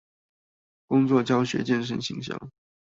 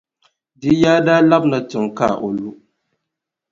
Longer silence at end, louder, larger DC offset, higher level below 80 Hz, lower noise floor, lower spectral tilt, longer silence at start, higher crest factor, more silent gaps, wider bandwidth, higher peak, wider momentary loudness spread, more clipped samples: second, 0.4 s vs 1 s; second, -25 LUFS vs -16 LUFS; neither; second, -64 dBFS vs -52 dBFS; first, under -90 dBFS vs -81 dBFS; about the same, -6 dB/octave vs -6.5 dB/octave; first, 0.9 s vs 0.6 s; about the same, 18 dB vs 18 dB; neither; about the same, 7.8 kHz vs 7.6 kHz; second, -10 dBFS vs 0 dBFS; about the same, 13 LU vs 13 LU; neither